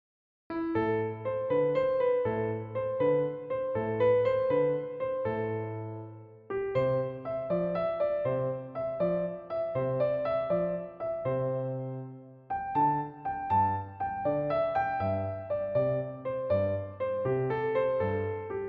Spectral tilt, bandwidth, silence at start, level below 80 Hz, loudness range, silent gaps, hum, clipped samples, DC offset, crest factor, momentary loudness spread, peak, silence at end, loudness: -7 dB/octave; 5 kHz; 0.5 s; -62 dBFS; 3 LU; none; none; under 0.1%; under 0.1%; 14 dB; 8 LU; -16 dBFS; 0 s; -31 LUFS